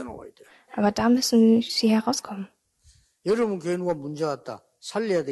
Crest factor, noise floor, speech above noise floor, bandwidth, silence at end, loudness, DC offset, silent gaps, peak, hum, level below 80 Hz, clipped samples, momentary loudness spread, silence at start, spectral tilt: 14 dB; -60 dBFS; 37 dB; 12.5 kHz; 0 s; -24 LUFS; under 0.1%; none; -10 dBFS; none; -60 dBFS; under 0.1%; 20 LU; 0 s; -4.5 dB/octave